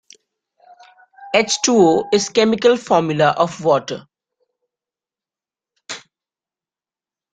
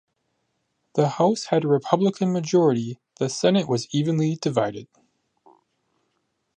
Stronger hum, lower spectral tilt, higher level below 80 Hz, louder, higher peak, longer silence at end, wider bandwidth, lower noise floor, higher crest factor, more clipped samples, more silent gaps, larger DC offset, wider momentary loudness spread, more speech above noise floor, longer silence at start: neither; second, -4 dB/octave vs -6 dB/octave; first, -62 dBFS vs -70 dBFS; first, -16 LUFS vs -22 LUFS; first, 0 dBFS vs -4 dBFS; second, 1.35 s vs 1.75 s; about the same, 9.4 kHz vs 10 kHz; first, under -90 dBFS vs -74 dBFS; about the same, 20 dB vs 20 dB; neither; neither; neither; first, 19 LU vs 9 LU; first, over 75 dB vs 52 dB; first, 1.2 s vs 0.95 s